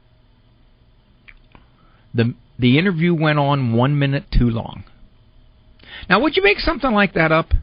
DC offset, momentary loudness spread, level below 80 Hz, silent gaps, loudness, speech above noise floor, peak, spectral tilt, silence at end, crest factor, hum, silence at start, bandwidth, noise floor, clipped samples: under 0.1%; 12 LU; -30 dBFS; none; -17 LUFS; 36 dB; -2 dBFS; -5 dB/octave; 0 s; 18 dB; none; 2.15 s; 5.2 kHz; -53 dBFS; under 0.1%